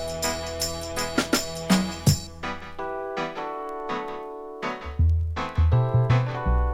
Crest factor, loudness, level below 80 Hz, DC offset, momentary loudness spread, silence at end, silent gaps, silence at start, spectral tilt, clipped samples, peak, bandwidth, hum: 18 dB; -26 LUFS; -32 dBFS; under 0.1%; 12 LU; 0 s; none; 0 s; -5 dB/octave; under 0.1%; -6 dBFS; 16.5 kHz; none